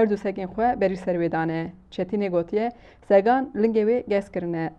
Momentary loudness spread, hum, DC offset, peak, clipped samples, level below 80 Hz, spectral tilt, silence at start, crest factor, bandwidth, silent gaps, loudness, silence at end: 9 LU; none; under 0.1%; -6 dBFS; under 0.1%; -54 dBFS; -8.5 dB/octave; 0 s; 18 dB; 9 kHz; none; -24 LUFS; 0.05 s